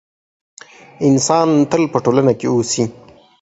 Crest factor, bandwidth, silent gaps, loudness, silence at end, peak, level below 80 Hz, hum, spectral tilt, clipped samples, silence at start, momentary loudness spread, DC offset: 16 dB; 8.2 kHz; none; -15 LUFS; 0.5 s; 0 dBFS; -54 dBFS; none; -5.5 dB/octave; under 0.1%; 1 s; 6 LU; under 0.1%